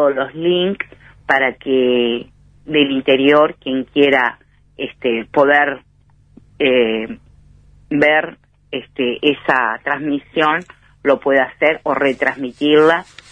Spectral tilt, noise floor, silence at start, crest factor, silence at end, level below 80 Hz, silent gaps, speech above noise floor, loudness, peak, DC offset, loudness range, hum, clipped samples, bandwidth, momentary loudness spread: -6 dB/octave; -51 dBFS; 0 s; 16 dB; 0.3 s; -54 dBFS; none; 36 dB; -16 LUFS; 0 dBFS; under 0.1%; 3 LU; none; under 0.1%; 9.2 kHz; 13 LU